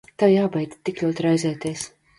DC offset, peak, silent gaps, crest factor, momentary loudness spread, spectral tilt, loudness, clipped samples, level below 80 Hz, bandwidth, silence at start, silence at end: under 0.1%; -6 dBFS; none; 18 dB; 11 LU; -6 dB/octave; -22 LUFS; under 0.1%; -62 dBFS; 11.5 kHz; 0.2 s; 0.3 s